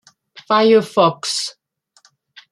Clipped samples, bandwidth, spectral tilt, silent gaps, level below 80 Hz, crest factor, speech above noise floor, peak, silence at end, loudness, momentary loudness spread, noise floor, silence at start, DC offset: under 0.1%; 12.5 kHz; -4 dB/octave; none; -70 dBFS; 16 dB; 42 dB; -2 dBFS; 1 s; -16 LUFS; 10 LU; -57 dBFS; 0.35 s; under 0.1%